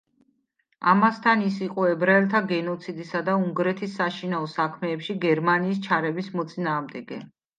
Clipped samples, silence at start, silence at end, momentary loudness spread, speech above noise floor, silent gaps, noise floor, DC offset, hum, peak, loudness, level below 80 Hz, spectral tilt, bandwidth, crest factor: under 0.1%; 0.8 s; 0.3 s; 11 LU; 48 dB; none; -72 dBFS; under 0.1%; none; -6 dBFS; -24 LUFS; -76 dBFS; -7 dB/octave; 9 kHz; 18 dB